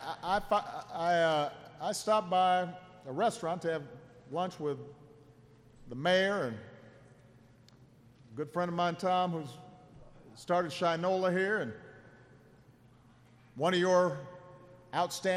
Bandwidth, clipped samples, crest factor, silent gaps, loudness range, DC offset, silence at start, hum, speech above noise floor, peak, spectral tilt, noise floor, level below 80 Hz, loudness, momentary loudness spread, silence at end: 14.5 kHz; under 0.1%; 18 dB; none; 5 LU; under 0.1%; 0 s; none; 29 dB; -16 dBFS; -5 dB/octave; -61 dBFS; -66 dBFS; -32 LUFS; 21 LU; 0 s